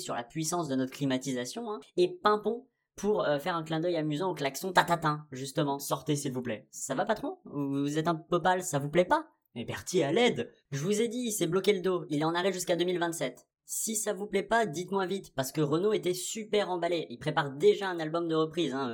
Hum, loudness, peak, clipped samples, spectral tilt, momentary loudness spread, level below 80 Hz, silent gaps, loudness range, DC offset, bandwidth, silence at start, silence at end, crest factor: none; -31 LUFS; -10 dBFS; under 0.1%; -4.5 dB/octave; 9 LU; -68 dBFS; none; 2 LU; under 0.1%; 19 kHz; 0 s; 0 s; 22 dB